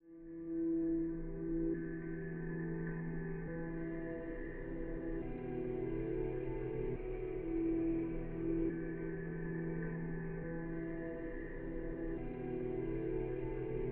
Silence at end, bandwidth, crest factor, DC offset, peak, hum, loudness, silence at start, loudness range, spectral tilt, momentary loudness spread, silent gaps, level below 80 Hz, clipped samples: 0 s; 3.3 kHz; 14 dB; under 0.1%; -26 dBFS; none; -41 LUFS; 0.05 s; 3 LU; -11.5 dB/octave; 7 LU; none; -48 dBFS; under 0.1%